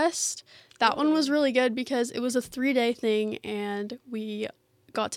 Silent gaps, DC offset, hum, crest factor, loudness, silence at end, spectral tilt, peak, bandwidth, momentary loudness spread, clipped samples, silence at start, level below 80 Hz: none; under 0.1%; none; 20 dB; -27 LUFS; 0 s; -3 dB/octave; -6 dBFS; 16 kHz; 12 LU; under 0.1%; 0 s; -70 dBFS